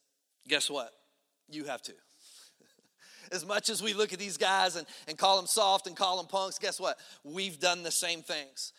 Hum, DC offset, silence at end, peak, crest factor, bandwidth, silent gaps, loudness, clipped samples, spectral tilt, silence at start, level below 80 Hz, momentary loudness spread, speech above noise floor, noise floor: none; under 0.1%; 0.1 s; -12 dBFS; 22 dB; 16.5 kHz; none; -31 LUFS; under 0.1%; -1 dB/octave; 0.45 s; -88 dBFS; 15 LU; 39 dB; -71 dBFS